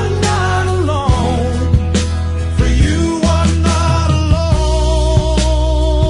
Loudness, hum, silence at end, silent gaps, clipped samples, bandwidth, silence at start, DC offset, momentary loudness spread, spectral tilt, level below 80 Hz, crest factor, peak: -14 LUFS; none; 0 s; none; under 0.1%; 11 kHz; 0 s; under 0.1%; 3 LU; -6 dB/octave; -18 dBFS; 12 dB; 0 dBFS